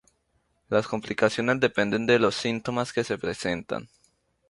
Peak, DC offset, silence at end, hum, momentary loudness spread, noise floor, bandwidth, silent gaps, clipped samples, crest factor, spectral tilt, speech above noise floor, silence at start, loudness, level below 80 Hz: -8 dBFS; under 0.1%; 0.65 s; none; 9 LU; -71 dBFS; 11.5 kHz; none; under 0.1%; 20 dB; -5 dB/octave; 46 dB; 0.7 s; -26 LUFS; -60 dBFS